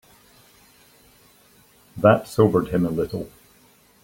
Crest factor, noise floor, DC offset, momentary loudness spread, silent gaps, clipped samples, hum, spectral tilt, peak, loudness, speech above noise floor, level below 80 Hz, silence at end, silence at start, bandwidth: 22 dB; -56 dBFS; under 0.1%; 18 LU; none; under 0.1%; none; -7.5 dB/octave; -2 dBFS; -21 LUFS; 36 dB; -52 dBFS; 0.75 s; 1.95 s; 17 kHz